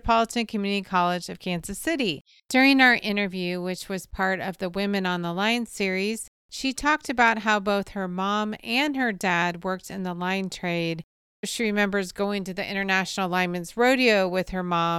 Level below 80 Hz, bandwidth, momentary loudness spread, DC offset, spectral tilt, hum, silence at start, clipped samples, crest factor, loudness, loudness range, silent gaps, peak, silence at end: -52 dBFS; 16 kHz; 11 LU; under 0.1%; -4.5 dB/octave; none; 0.05 s; under 0.1%; 20 dB; -24 LUFS; 4 LU; 2.21-2.25 s, 6.28-6.49 s, 11.04-11.43 s; -6 dBFS; 0 s